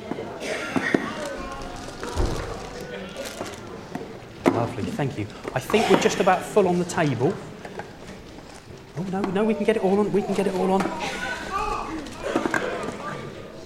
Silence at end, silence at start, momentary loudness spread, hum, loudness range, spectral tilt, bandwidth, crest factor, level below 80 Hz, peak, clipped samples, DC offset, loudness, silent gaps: 0 s; 0 s; 16 LU; none; 7 LU; -5.5 dB/octave; 16 kHz; 24 dB; -42 dBFS; -2 dBFS; under 0.1%; under 0.1%; -25 LUFS; none